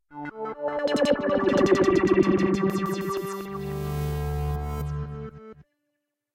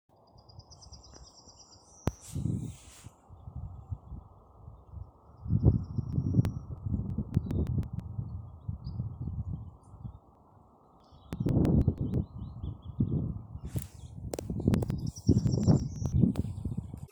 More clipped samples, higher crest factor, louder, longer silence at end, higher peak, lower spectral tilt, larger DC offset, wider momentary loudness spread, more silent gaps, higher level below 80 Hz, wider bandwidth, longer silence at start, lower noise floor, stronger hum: neither; second, 18 dB vs 24 dB; first, -25 LUFS vs -32 LUFS; first, 0.7 s vs 0.05 s; about the same, -8 dBFS vs -10 dBFS; second, -6.5 dB/octave vs -8.5 dB/octave; neither; second, 14 LU vs 24 LU; neither; about the same, -40 dBFS vs -42 dBFS; second, 16.5 kHz vs over 20 kHz; second, 0.1 s vs 0.6 s; first, -80 dBFS vs -60 dBFS; neither